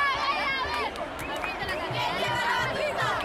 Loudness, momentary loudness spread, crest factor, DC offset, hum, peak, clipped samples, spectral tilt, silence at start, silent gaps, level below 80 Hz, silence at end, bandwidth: -28 LUFS; 6 LU; 14 dB; under 0.1%; none; -14 dBFS; under 0.1%; -3.5 dB/octave; 0 s; none; -50 dBFS; 0 s; 16.5 kHz